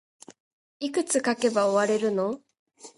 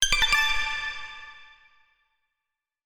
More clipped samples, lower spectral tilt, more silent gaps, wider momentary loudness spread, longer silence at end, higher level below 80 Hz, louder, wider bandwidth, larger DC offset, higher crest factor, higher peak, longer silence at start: neither; first, -3.5 dB/octave vs 1.5 dB/octave; first, 2.59-2.66 s vs none; second, 9 LU vs 22 LU; second, 0.1 s vs 1.4 s; second, -74 dBFS vs -40 dBFS; about the same, -25 LUFS vs -23 LUFS; second, 11.5 kHz vs over 20 kHz; neither; about the same, 18 dB vs 22 dB; second, -10 dBFS vs -6 dBFS; first, 0.8 s vs 0 s